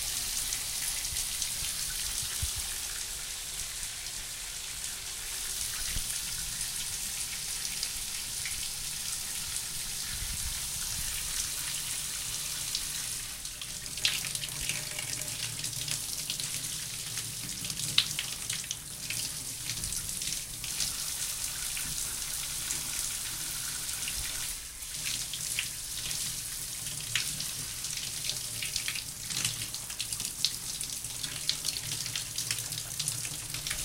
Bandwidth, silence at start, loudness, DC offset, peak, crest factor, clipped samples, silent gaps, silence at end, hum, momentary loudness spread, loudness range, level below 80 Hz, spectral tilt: 17 kHz; 0 s; -32 LUFS; under 0.1%; -6 dBFS; 30 dB; under 0.1%; none; 0 s; none; 4 LU; 1 LU; -50 dBFS; 0 dB/octave